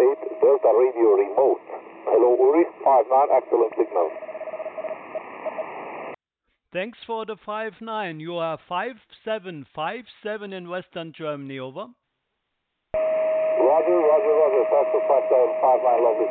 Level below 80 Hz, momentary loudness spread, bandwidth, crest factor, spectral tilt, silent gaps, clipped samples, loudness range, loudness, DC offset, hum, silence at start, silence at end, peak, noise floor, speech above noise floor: -68 dBFS; 16 LU; 4.2 kHz; 14 dB; -10 dB/octave; none; under 0.1%; 13 LU; -22 LUFS; under 0.1%; none; 0 s; 0 s; -8 dBFS; -78 dBFS; 56 dB